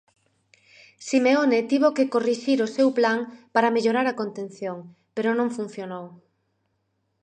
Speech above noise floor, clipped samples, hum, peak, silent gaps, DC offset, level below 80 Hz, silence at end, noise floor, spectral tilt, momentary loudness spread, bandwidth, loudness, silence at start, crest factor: 50 dB; under 0.1%; none; -4 dBFS; none; under 0.1%; -80 dBFS; 1.1 s; -73 dBFS; -5 dB/octave; 15 LU; 9.4 kHz; -23 LUFS; 1 s; 20 dB